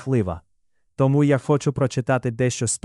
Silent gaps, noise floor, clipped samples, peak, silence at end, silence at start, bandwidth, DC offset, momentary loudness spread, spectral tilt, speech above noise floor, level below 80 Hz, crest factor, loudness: none; -72 dBFS; under 0.1%; -6 dBFS; 0.1 s; 0 s; 12 kHz; under 0.1%; 5 LU; -6 dB/octave; 51 dB; -50 dBFS; 14 dB; -21 LUFS